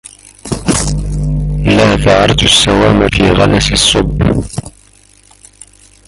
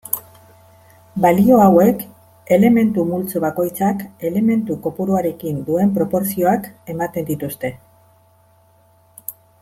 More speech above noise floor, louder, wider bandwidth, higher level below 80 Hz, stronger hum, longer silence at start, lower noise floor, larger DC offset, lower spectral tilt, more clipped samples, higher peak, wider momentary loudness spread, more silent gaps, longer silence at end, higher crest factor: about the same, 35 dB vs 37 dB; first, -10 LUFS vs -17 LUFS; second, 13.5 kHz vs 16.5 kHz; first, -22 dBFS vs -54 dBFS; first, 50 Hz at -25 dBFS vs none; first, 0.45 s vs 0.05 s; second, -44 dBFS vs -54 dBFS; neither; second, -4.5 dB/octave vs -7.5 dB/octave; neither; about the same, 0 dBFS vs -2 dBFS; second, 11 LU vs 16 LU; neither; first, 1.4 s vs 0.3 s; second, 12 dB vs 18 dB